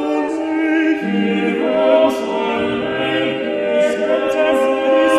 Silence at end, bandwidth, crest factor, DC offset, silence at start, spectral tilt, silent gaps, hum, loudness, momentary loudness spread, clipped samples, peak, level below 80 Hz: 0 s; 13 kHz; 16 dB; under 0.1%; 0 s; -5.5 dB/octave; none; none; -17 LUFS; 5 LU; under 0.1%; 0 dBFS; -56 dBFS